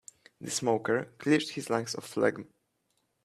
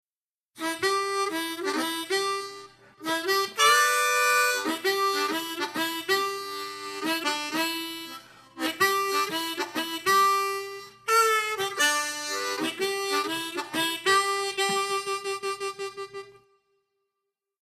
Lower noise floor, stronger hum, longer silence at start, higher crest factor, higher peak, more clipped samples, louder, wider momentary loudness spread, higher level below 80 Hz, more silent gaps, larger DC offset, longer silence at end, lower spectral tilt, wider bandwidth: second, -77 dBFS vs under -90 dBFS; neither; second, 0.4 s vs 0.55 s; about the same, 20 dB vs 18 dB; about the same, -10 dBFS vs -10 dBFS; neither; second, -30 LUFS vs -26 LUFS; second, 8 LU vs 13 LU; about the same, -74 dBFS vs -76 dBFS; neither; neither; second, 0.8 s vs 1.3 s; first, -4 dB/octave vs -0.5 dB/octave; about the same, 14 kHz vs 14 kHz